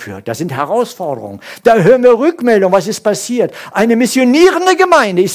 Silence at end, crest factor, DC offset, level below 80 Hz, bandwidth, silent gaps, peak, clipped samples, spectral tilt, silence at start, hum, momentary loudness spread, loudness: 0 s; 12 dB; under 0.1%; -54 dBFS; 16 kHz; none; 0 dBFS; 0.5%; -5 dB/octave; 0 s; none; 13 LU; -11 LUFS